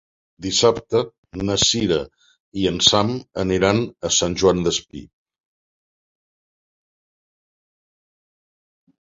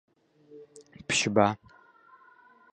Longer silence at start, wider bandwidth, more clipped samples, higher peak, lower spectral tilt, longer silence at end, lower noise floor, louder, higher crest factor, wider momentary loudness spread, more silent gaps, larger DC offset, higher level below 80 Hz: second, 0.4 s vs 0.55 s; second, 8 kHz vs 11.5 kHz; neither; first, 0 dBFS vs -6 dBFS; about the same, -3.5 dB/octave vs -3.5 dB/octave; first, 4 s vs 1.2 s; first, under -90 dBFS vs -58 dBFS; first, -19 LUFS vs -26 LUFS; about the same, 22 dB vs 26 dB; second, 16 LU vs 27 LU; first, 1.18-1.23 s, 2.40-2.52 s vs none; neither; first, -46 dBFS vs -64 dBFS